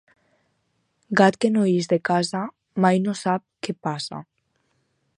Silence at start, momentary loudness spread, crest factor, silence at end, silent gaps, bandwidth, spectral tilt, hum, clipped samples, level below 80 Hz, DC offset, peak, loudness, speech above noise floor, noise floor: 1.1 s; 13 LU; 20 dB; 0.95 s; none; 11 kHz; -6 dB/octave; none; under 0.1%; -70 dBFS; under 0.1%; -4 dBFS; -22 LUFS; 50 dB; -71 dBFS